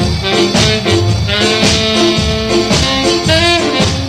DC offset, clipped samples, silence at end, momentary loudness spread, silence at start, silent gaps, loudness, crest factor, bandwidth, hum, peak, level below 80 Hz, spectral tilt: under 0.1%; under 0.1%; 0 s; 3 LU; 0 s; none; -11 LUFS; 12 dB; 15.5 kHz; none; 0 dBFS; -26 dBFS; -4 dB/octave